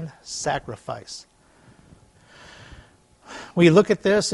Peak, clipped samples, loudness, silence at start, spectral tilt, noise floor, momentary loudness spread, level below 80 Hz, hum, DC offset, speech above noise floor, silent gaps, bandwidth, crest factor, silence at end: -2 dBFS; under 0.1%; -21 LUFS; 0 s; -5 dB/octave; -54 dBFS; 24 LU; -56 dBFS; none; under 0.1%; 33 dB; none; 11.5 kHz; 22 dB; 0 s